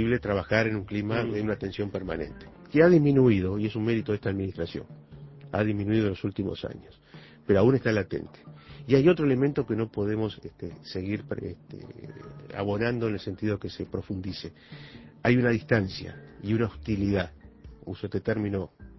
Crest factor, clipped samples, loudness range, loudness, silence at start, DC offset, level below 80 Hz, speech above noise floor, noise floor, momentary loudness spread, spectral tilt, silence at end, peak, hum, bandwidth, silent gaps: 20 dB; under 0.1%; 8 LU; -27 LUFS; 0 s; under 0.1%; -50 dBFS; 19 dB; -46 dBFS; 22 LU; -8.5 dB/octave; 0.05 s; -6 dBFS; none; 6 kHz; none